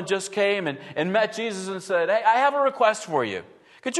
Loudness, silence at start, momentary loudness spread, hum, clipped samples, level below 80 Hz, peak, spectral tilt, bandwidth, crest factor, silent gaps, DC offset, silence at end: -23 LUFS; 0 s; 10 LU; none; under 0.1%; -76 dBFS; -6 dBFS; -3.5 dB/octave; 12.5 kHz; 18 dB; none; under 0.1%; 0 s